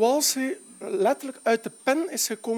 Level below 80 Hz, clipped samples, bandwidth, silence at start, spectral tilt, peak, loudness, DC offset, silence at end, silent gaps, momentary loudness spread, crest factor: -84 dBFS; under 0.1%; 19 kHz; 0 s; -2 dB/octave; -8 dBFS; -25 LUFS; under 0.1%; 0 s; none; 9 LU; 16 dB